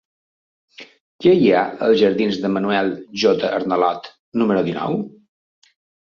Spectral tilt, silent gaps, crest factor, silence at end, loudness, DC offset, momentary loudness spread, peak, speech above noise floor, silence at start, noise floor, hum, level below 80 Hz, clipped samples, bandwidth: -6.5 dB/octave; 1.00-1.19 s, 4.19-4.32 s; 18 dB; 1 s; -18 LUFS; under 0.1%; 10 LU; -2 dBFS; over 73 dB; 0.8 s; under -90 dBFS; none; -60 dBFS; under 0.1%; 7 kHz